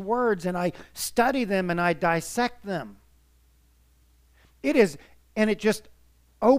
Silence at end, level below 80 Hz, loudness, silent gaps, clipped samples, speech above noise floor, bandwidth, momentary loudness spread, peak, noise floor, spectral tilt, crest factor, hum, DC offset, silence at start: 0 s; -56 dBFS; -26 LUFS; none; under 0.1%; 35 dB; 15.5 kHz; 11 LU; -6 dBFS; -61 dBFS; -5 dB/octave; 20 dB; none; under 0.1%; 0 s